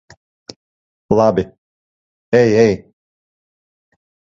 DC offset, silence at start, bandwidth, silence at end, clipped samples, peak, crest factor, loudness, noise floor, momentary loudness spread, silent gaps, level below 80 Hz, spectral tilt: under 0.1%; 1.1 s; 7.6 kHz; 1.55 s; under 0.1%; 0 dBFS; 18 dB; -15 LUFS; under -90 dBFS; 12 LU; 1.58-2.32 s; -48 dBFS; -7 dB/octave